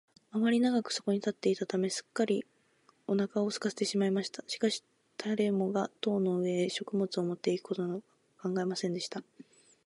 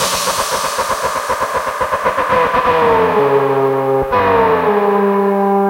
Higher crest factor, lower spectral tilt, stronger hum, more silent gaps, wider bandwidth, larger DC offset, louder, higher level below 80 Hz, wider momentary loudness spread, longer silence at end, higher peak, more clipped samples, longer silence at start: about the same, 16 dB vs 14 dB; about the same, -5 dB/octave vs -4 dB/octave; neither; neither; second, 11.5 kHz vs 16 kHz; neither; second, -32 LUFS vs -14 LUFS; second, -80 dBFS vs -42 dBFS; first, 9 LU vs 6 LU; first, 0.45 s vs 0 s; second, -16 dBFS vs 0 dBFS; neither; first, 0.35 s vs 0 s